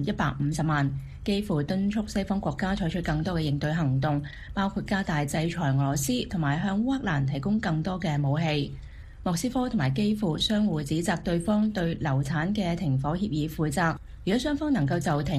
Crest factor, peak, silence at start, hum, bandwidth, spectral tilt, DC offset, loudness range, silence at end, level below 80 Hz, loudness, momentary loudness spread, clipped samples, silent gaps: 16 dB; -10 dBFS; 0 s; none; 15 kHz; -6 dB/octave; under 0.1%; 1 LU; 0 s; -44 dBFS; -27 LUFS; 4 LU; under 0.1%; none